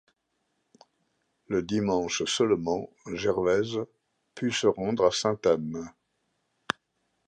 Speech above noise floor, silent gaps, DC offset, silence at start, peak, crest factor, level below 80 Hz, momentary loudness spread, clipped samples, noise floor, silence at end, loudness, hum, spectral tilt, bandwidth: 50 dB; none; under 0.1%; 1.5 s; -6 dBFS; 24 dB; -60 dBFS; 10 LU; under 0.1%; -77 dBFS; 1.35 s; -28 LUFS; none; -4.5 dB/octave; 10 kHz